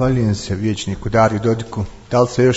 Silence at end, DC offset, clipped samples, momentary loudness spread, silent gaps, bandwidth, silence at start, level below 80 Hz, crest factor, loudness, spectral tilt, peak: 0 s; under 0.1%; under 0.1%; 8 LU; none; 8 kHz; 0 s; -38 dBFS; 16 dB; -18 LUFS; -6.5 dB/octave; 0 dBFS